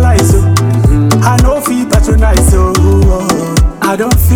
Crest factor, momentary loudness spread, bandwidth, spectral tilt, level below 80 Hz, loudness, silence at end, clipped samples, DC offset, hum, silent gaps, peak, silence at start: 8 dB; 4 LU; over 20 kHz; -6 dB/octave; -12 dBFS; -9 LUFS; 0 s; under 0.1%; under 0.1%; none; none; 0 dBFS; 0 s